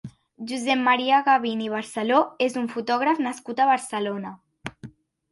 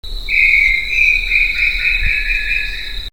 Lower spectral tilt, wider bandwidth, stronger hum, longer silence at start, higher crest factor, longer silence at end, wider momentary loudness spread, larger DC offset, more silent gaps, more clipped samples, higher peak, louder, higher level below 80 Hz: first, -4 dB/octave vs -1.5 dB/octave; second, 11.5 kHz vs over 20 kHz; neither; about the same, 0.05 s vs 0.05 s; about the same, 18 dB vs 16 dB; first, 0.45 s vs 0 s; first, 19 LU vs 8 LU; second, under 0.1% vs 3%; neither; neither; second, -6 dBFS vs 0 dBFS; second, -23 LUFS vs -12 LUFS; second, -68 dBFS vs -26 dBFS